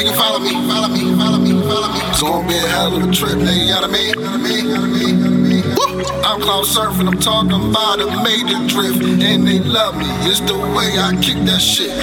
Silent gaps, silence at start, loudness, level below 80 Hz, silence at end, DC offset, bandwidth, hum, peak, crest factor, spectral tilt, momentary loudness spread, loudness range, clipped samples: none; 0 s; -14 LUFS; -36 dBFS; 0 s; under 0.1%; 19 kHz; none; -2 dBFS; 14 dB; -4 dB/octave; 4 LU; 1 LU; under 0.1%